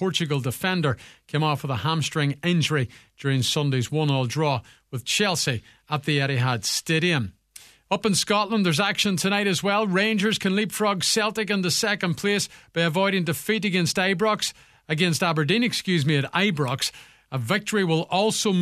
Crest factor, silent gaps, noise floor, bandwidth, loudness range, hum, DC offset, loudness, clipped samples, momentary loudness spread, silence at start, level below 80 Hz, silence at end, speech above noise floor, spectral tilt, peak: 18 dB; none; -50 dBFS; 14 kHz; 2 LU; none; under 0.1%; -23 LUFS; under 0.1%; 6 LU; 0 s; -60 dBFS; 0 s; 27 dB; -4 dB/octave; -6 dBFS